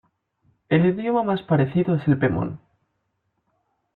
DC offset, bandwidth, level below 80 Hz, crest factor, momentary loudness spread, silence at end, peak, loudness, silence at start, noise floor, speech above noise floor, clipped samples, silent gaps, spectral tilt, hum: under 0.1%; 4.2 kHz; -56 dBFS; 16 dB; 7 LU; 1.4 s; -6 dBFS; -22 LUFS; 0.7 s; -74 dBFS; 53 dB; under 0.1%; none; -11 dB/octave; none